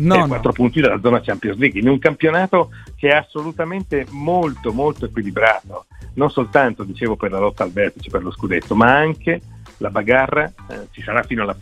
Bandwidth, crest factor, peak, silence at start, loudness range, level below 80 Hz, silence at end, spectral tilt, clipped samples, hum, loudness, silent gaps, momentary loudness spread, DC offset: 11.5 kHz; 18 dB; 0 dBFS; 0 s; 3 LU; -40 dBFS; 0 s; -7.5 dB/octave; under 0.1%; none; -18 LUFS; none; 10 LU; under 0.1%